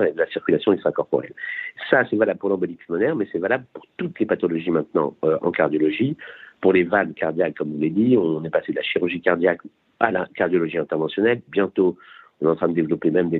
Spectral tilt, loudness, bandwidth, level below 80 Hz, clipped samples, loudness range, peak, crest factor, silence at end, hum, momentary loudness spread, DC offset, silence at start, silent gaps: -9.5 dB/octave; -22 LUFS; 4.3 kHz; -64 dBFS; under 0.1%; 2 LU; -2 dBFS; 20 dB; 0 s; none; 7 LU; under 0.1%; 0 s; none